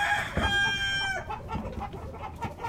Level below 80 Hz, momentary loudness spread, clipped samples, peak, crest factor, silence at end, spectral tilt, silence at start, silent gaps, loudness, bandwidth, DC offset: -42 dBFS; 14 LU; under 0.1%; -14 dBFS; 16 dB; 0 s; -3.5 dB/octave; 0 s; none; -29 LUFS; 16 kHz; under 0.1%